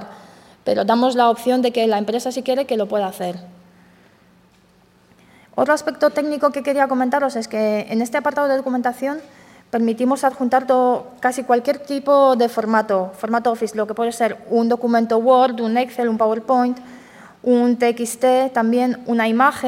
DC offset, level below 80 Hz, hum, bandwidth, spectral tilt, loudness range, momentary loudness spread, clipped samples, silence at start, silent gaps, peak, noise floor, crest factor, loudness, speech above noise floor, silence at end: under 0.1%; -66 dBFS; none; 16 kHz; -5 dB/octave; 6 LU; 7 LU; under 0.1%; 0 s; none; -2 dBFS; -54 dBFS; 16 dB; -19 LUFS; 36 dB; 0 s